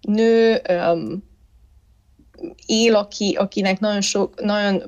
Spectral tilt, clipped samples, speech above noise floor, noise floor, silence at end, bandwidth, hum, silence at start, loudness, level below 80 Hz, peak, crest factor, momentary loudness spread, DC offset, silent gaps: -4.5 dB/octave; under 0.1%; 35 dB; -54 dBFS; 0 s; 10 kHz; none; 0.05 s; -19 LUFS; -54 dBFS; -6 dBFS; 14 dB; 16 LU; under 0.1%; none